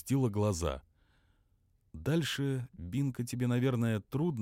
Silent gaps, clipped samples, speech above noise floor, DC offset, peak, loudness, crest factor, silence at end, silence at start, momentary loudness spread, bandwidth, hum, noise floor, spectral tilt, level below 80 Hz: none; under 0.1%; 39 dB; under 0.1%; -20 dBFS; -33 LUFS; 14 dB; 0 s; 0.05 s; 8 LU; 16.5 kHz; none; -71 dBFS; -6.5 dB/octave; -54 dBFS